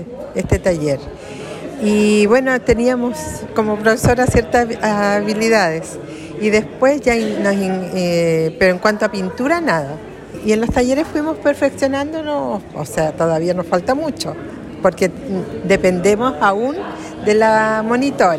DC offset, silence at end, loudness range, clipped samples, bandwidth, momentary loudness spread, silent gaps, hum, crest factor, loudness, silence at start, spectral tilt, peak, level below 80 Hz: under 0.1%; 0 s; 3 LU; under 0.1%; 15 kHz; 12 LU; none; none; 14 dB; -16 LUFS; 0 s; -5.5 dB/octave; -2 dBFS; -38 dBFS